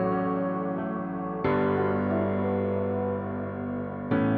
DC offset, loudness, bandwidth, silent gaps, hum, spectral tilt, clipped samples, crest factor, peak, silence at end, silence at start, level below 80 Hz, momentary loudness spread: under 0.1%; -28 LUFS; 4.7 kHz; none; none; -11.5 dB/octave; under 0.1%; 14 dB; -12 dBFS; 0 s; 0 s; -56 dBFS; 7 LU